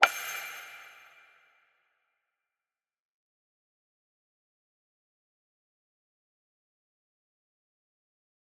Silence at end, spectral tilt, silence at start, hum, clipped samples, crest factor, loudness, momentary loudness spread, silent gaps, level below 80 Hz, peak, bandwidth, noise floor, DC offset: 7.55 s; 2 dB/octave; 0 s; none; under 0.1%; 40 dB; -32 LUFS; 23 LU; none; under -90 dBFS; 0 dBFS; 15 kHz; under -90 dBFS; under 0.1%